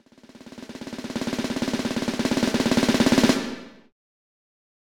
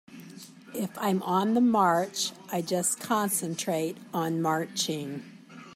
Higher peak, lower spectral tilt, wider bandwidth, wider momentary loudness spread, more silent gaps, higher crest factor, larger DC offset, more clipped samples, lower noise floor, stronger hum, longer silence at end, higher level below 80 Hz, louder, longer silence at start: first, -6 dBFS vs -12 dBFS; about the same, -4.5 dB/octave vs -4 dB/octave; first, 19.5 kHz vs 16 kHz; about the same, 20 LU vs 20 LU; neither; about the same, 20 dB vs 18 dB; neither; neither; about the same, -48 dBFS vs -47 dBFS; neither; first, 1.25 s vs 0 s; first, -50 dBFS vs -76 dBFS; first, -23 LUFS vs -28 LUFS; first, 0.45 s vs 0.1 s